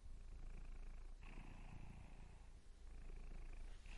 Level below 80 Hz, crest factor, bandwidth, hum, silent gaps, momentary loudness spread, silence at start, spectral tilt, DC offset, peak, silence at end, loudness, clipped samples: -54 dBFS; 10 dB; 11 kHz; none; none; 4 LU; 0 s; -5.5 dB/octave; under 0.1%; -44 dBFS; 0 s; -61 LUFS; under 0.1%